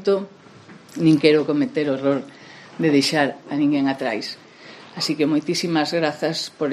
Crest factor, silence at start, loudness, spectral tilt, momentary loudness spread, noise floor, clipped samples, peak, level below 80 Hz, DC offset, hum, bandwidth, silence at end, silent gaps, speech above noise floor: 20 dB; 0 s; -21 LUFS; -5 dB/octave; 20 LU; -45 dBFS; under 0.1%; -2 dBFS; -68 dBFS; under 0.1%; none; 13 kHz; 0 s; none; 25 dB